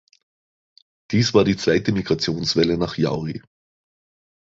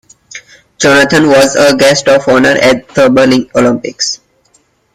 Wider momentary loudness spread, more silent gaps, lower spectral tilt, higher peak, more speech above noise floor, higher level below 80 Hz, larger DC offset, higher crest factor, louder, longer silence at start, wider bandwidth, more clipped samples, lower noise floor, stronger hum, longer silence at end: about the same, 9 LU vs 8 LU; neither; first, -5.5 dB/octave vs -4 dB/octave; about the same, -2 dBFS vs 0 dBFS; first, over 70 dB vs 45 dB; second, -48 dBFS vs -42 dBFS; neither; first, 20 dB vs 10 dB; second, -20 LUFS vs -8 LUFS; first, 1.1 s vs 0.35 s; second, 8 kHz vs 15.5 kHz; neither; first, under -90 dBFS vs -52 dBFS; neither; first, 1.1 s vs 0.8 s